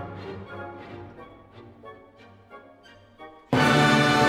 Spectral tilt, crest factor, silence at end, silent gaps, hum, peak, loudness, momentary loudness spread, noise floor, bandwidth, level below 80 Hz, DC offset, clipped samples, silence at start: -5 dB/octave; 20 dB; 0 s; none; none; -8 dBFS; -20 LUFS; 28 LU; -52 dBFS; 15.5 kHz; -56 dBFS; under 0.1%; under 0.1%; 0 s